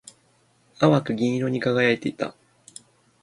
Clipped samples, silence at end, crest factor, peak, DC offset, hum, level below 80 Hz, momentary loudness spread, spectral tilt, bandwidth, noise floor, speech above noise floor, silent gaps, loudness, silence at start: under 0.1%; 0.9 s; 22 dB; -4 dBFS; under 0.1%; none; -64 dBFS; 24 LU; -6.5 dB/octave; 11.5 kHz; -62 dBFS; 40 dB; none; -23 LUFS; 0.8 s